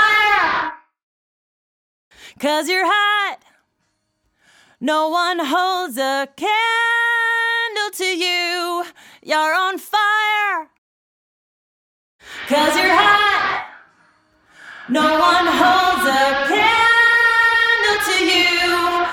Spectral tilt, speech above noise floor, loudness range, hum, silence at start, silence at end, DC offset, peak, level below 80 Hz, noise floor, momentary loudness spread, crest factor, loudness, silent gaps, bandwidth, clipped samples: -1.5 dB/octave; 53 dB; 8 LU; none; 0 s; 0 s; under 0.1%; 0 dBFS; -54 dBFS; -70 dBFS; 10 LU; 18 dB; -16 LUFS; 1.03-2.11 s, 10.78-12.19 s; 19 kHz; under 0.1%